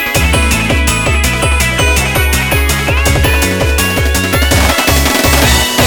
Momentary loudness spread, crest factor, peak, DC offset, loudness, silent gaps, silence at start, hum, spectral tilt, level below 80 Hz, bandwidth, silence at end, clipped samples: 3 LU; 10 dB; 0 dBFS; under 0.1%; -10 LUFS; none; 0 s; none; -3.5 dB/octave; -16 dBFS; 19.5 kHz; 0 s; under 0.1%